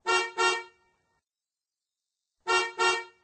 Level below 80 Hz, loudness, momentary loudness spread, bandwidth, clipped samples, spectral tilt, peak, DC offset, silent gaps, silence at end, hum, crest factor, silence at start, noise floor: -74 dBFS; -26 LUFS; 8 LU; 9.8 kHz; under 0.1%; 0 dB/octave; -12 dBFS; under 0.1%; none; 0.15 s; none; 18 dB; 0.05 s; under -90 dBFS